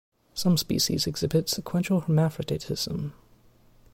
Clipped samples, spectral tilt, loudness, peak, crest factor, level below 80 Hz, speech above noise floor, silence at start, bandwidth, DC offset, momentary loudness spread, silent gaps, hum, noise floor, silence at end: under 0.1%; -5 dB/octave; -26 LUFS; -12 dBFS; 16 dB; -52 dBFS; 31 dB; 0.35 s; 16.5 kHz; under 0.1%; 8 LU; none; none; -57 dBFS; 0.8 s